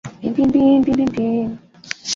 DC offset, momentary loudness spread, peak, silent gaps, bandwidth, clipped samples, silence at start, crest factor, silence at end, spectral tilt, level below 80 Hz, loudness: under 0.1%; 15 LU; -2 dBFS; none; 7.6 kHz; under 0.1%; 0.05 s; 16 dB; 0 s; -5 dB/octave; -46 dBFS; -17 LUFS